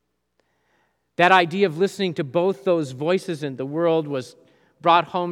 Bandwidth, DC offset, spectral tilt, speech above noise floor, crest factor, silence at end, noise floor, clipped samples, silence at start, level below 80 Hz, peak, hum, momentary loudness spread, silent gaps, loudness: 13 kHz; under 0.1%; -5.5 dB/octave; 50 dB; 22 dB; 0 s; -71 dBFS; under 0.1%; 1.2 s; -76 dBFS; -2 dBFS; 60 Hz at -55 dBFS; 13 LU; none; -21 LUFS